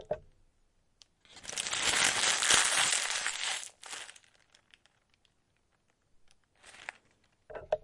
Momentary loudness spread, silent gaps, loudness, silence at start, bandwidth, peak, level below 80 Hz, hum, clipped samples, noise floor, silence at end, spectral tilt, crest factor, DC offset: 23 LU; none; -28 LUFS; 0 s; 11.5 kHz; -8 dBFS; -66 dBFS; none; under 0.1%; -74 dBFS; 0.05 s; 1 dB/octave; 28 dB; under 0.1%